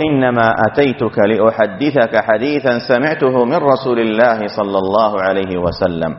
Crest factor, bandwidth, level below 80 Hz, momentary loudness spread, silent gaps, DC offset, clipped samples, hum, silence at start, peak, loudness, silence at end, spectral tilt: 14 dB; 6 kHz; -46 dBFS; 4 LU; none; under 0.1%; under 0.1%; none; 0 s; 0 dBFS; -14 LUFS; 0 s; -4.5 dB/octave